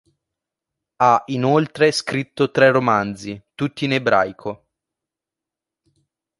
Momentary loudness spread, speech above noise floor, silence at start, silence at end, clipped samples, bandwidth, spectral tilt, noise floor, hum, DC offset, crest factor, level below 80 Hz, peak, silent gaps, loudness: 17 LU; 69 dB; 1 s; 1.85 s; under 0.1%; 11.5 kHz; -5.5 dB/octave; -87 dBFS; none; under 0.1%; 20 dB; -60 dBFS; -2 dBFS; none; -18 LUFS